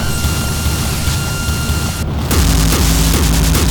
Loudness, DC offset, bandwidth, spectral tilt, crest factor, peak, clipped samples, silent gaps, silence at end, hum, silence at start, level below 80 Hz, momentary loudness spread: -15 LUFS; under 0.1%; over 20 kHz; -4 dB/octave; 14 dB; 0 dBFS; under 0.1%; none; 0 s; none; 0 s; -18 dBFS; 5 LU